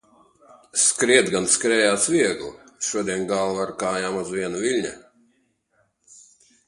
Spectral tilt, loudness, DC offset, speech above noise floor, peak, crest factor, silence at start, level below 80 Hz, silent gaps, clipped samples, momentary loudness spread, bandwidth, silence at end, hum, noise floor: -2.5 dB/octave; -21 LUFS; under 0.1%; 46 dB; 0 dBFS; 24 dB; 0.75 s; -62 dBFS; none; under 0.1%; 10 LU; 11.5 kHz; 1.7 s; none; -68 dBFS